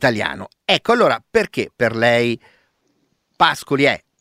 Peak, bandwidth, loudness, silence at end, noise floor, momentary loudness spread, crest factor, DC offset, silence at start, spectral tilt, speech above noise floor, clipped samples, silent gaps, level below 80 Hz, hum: 0 dBFS; 16 kHz; -17 LUFS; 0.25 s; -66 dBFS; 8 LU; 18 dB; under 0.1%; 0 s; -4.5 dB/octave; 48 dB; under 0.1%; none; -54 dBFS; none